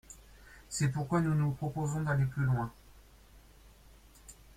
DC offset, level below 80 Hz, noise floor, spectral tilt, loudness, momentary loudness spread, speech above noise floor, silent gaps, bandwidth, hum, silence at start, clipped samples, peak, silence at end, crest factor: under 0.1%; -56 dBFS; -58 dBFS; -6.5 dB/octave; -33 LUFS; 23 LU; 27 dB; none; 15.5 kHz; none; 0.1 s; under 0.1%; -16 dBFS; 0.25 s; 18 dB